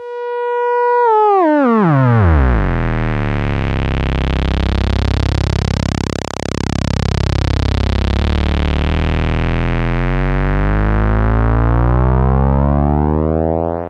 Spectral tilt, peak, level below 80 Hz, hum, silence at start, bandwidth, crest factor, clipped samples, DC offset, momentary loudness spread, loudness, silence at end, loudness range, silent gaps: -7.5 dB/octave; 0 dBFS; -18 dBFS; none; 0 s; 9 kHz; 14 dB; under 0.1%; under 0.1%; 6 LU; -15 LUFS; 0 s; 4 LU; none